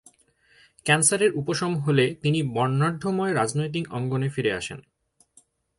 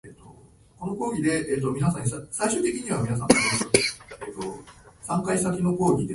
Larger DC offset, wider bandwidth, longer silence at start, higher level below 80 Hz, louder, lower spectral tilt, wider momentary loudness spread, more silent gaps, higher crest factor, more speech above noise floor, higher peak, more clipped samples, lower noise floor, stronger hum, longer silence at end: neither; about the same, 11.5 kHz vs 11.5 kHz; first, 0.85 s vs 0.05 s; second, -60 dBFS vs -52 dBFS; about the same, -24 LUFS vs -25 LUFS; about the same, -4.5 dB/octave vs -4.5 dB/octave; second, 9 LU vs 15 LU; neither; second, 18 dB vs 24 dB; first, 37 dB vs 28 dB; second, -6 dBFS vs -2 dBFS; neither; first, -61 dBFS vs -52 dBFS; neither; first, 1 s vs 0 s